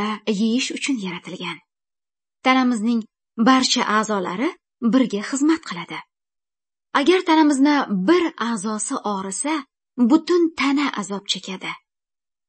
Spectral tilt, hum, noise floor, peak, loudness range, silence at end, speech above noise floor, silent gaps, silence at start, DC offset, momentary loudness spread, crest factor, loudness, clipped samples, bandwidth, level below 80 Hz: -4 dB/octave; none; under -90 dBFS; -2 dBFS; 3 LU; 0.7 s; over 70 dB; none; 0 s; under 0.1%; 14 LU; 18 dB; -20 LUFS; under 0.1%; 8.8 kHz; -70 dBFS